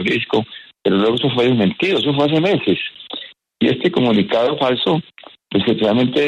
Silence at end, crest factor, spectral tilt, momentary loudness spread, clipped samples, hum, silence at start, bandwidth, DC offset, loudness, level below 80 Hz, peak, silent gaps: 0 s; 14 dB; -7 dB/octave; 9 LU; under 0.1%; none; 0 s; 10.5 kHz; under 0.1%; -17 LUFS; -56 dBFS; -4 dBFS; none